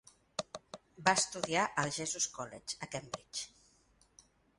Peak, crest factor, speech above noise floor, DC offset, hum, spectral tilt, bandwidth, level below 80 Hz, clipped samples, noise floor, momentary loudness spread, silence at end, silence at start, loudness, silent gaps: -12 dBFS; 26 dB; 33 dB; under 0.1%; none; -2 dB/octave; 11.5 kHz; -72 dBFS; under 0.1%; -69 dBFS; 16 LU; 1.1 s; 0.4 s; -35 LUFS; none